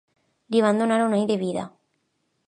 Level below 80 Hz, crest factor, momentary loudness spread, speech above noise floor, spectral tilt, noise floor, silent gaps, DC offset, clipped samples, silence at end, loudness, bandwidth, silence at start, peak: -72 dBFS; 16 dB; 11 LU; 51 dB; -6 dB/octave; -73 dBFS; none; under 0.1%; under 0.1%; 0.8 s; -23 LUFS; 10.5 kHz; 0.5 s; -8 dBFS